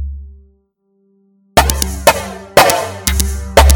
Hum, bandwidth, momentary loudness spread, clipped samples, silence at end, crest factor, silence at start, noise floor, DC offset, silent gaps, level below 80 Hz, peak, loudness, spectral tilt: none; over 20 kHz; 10 LU; 0.5%; 0 s; 14 dB; 0 s; -60 dBFS; under 0.1%; none; -20 dBFS; 0 dBFS; -13 LUFS; -3.5 dB/octave